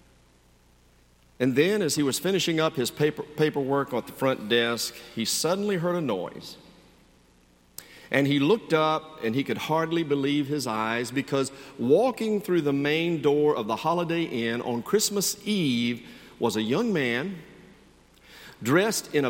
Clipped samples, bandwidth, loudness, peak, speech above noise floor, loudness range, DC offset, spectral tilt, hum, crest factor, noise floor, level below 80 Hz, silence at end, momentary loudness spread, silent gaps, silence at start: under 0.1%; 17 kHz; -26 LUFS; -6 dBFS; 34 dB; 3 LU; under 0.1%; -4.5 dB/octave; none; 20 dB; -59 dBFS; -64 dBFS; 0 s; 8 LU; none; 1.4 s